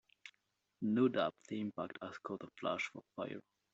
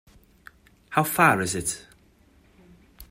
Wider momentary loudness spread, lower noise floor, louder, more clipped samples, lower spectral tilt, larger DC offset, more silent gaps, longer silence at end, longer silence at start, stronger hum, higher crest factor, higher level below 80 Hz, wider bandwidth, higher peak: first, 18 LU vs 11 LU; first, -83 dBFS vs -58 dBFS; second, -40 LUFS vs -23 LUFS; neither; about the same, -4.5 dB/octave vs -4 dB/octave; neither; neither; first, 0.35 s vs 0.05 s; second, 0.25 s vs 0.9 s; neither; about the same, 20 dB vs 24 dB; second, -82 dBFS vs -56 dBFS; second, 8 kHz vs 16 kHz; second, -20 dBFS vs -4 dBFS